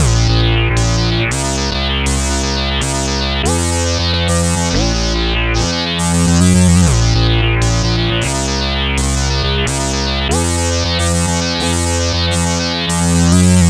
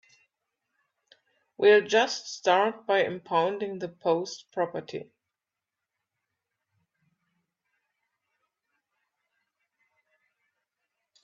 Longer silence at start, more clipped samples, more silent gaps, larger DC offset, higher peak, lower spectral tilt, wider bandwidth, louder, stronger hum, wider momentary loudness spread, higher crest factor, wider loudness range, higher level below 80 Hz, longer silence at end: second, 0 s vs 1.6 s; neither; neither; neither; first, 0 dBFS vs -10 dBFS; about the same, -4 dB/octave vs -3.5 dB/octave; first, 14.5 kHz vs 7.4 kHz; first, -14 LUFS vs -26 LUFS; neither; second, 5 LU vs 14 LU; second, 14 dB vs 22 dB; second, 2 LU vs 14 LU; first, -20 dBFS vs -82 dBFS; second, 0 s vs 6.2 s